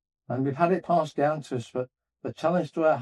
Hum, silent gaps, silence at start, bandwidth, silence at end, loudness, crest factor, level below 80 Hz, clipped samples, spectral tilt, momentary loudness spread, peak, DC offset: none; none; 0.3 s; 11 kHz; 0 s; -27 LUFS; 18 dB; -74 dBFS; under 0.1%; -7.5 dB/octave; 12 LU; -8 dBFS; under 0.1%